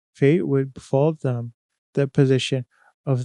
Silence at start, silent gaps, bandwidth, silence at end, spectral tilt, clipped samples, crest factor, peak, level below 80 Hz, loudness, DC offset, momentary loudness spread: 0.2 s; 1.54-1.69 s, 1.78-1.93 s, 2.94-3.04 s; 10 kHz; 0 s; -7 dB/octave; under 0.1%; 18 dB; -4 dBFS; -62 dBFS; -22 LUFS; under 0.1%; 13 LU